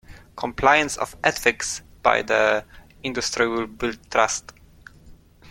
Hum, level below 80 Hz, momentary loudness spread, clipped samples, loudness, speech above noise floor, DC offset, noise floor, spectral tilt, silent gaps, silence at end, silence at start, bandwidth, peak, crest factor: none; -48 dBFS; 12 LU; under 0.1%; -22 LUFS; 26 dB; under 0.1%; -48 dBFS; -2.5 dB/octave; none; 0 s; 0.1 s; 16.5 kHz; 0 dBFS; 24 dB